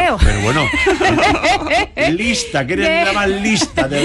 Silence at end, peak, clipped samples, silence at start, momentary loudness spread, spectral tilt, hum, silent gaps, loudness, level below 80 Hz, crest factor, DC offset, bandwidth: 0 s; 0 dBFS; under 0.1%; 0 s; 4 LU; -4 dB/octave; none; none; -14 LUFS; -24 dBFS; 14 dB; under 0.1%; 12 kHz